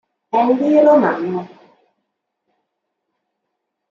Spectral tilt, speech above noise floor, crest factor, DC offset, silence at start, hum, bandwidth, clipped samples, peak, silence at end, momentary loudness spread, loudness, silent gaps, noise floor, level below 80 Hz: -8 dB/octave; 62 dB; 16 dB; under 0.1%; 0.35 s; none; 7 kHz; under 0.1%; -2 dBFS; 2.45 s; 12 LU; -15 LUFS; none; -76 dBFS; -74 dBFS